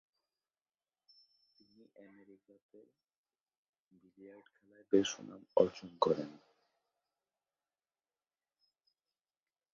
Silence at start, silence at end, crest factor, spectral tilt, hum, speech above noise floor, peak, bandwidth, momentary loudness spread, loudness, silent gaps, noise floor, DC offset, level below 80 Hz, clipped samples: 4.2 s; 3.4 s; 28 dB; -4.5 dB/octave; none; over 52 dB; -14 dBFS; 7.4 kHz; 25 LU; -35 LUFS; none; under -90 dBFS; under 0.1%; -78 dBFS; under 0.1%